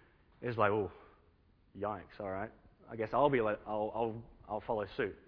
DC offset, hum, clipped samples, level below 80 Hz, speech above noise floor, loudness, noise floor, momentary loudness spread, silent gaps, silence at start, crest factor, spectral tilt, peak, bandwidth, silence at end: under 0.1%; none; under 0.1%; -62 dBFS; 32 dB; -36 LUFS; -68 dBFS; 13 LU; none; 0.4 s; 22 dB; -5 dB/octave; -14 dBFS; 5.4 kHz; 0.1 s